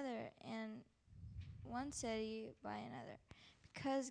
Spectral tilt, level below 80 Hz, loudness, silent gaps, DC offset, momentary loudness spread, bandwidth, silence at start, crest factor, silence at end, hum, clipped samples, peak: -4.5 dB/octave; -68 dBFS; -48 LUFS; none; under 0.1%; 17 LU; 10 kHz; 0 s; 16 dB; 0 s; none; under 0.1%; -32 dBFS